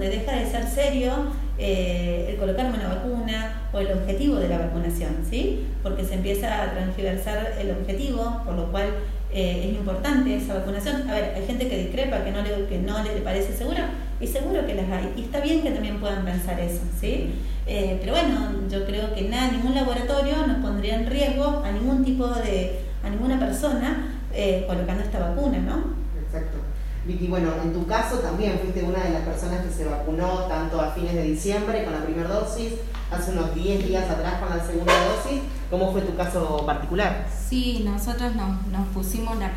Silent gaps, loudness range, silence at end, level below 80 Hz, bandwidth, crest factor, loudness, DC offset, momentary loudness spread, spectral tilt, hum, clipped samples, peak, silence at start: none; 3 LU; 0 s; -28 dBFS; 15.5 kHz; 18 dB; -26 LUFS; under 0.1%; 6 LU; -6 dB/octave; none; under 0.1%; -6 dBFS; 0 s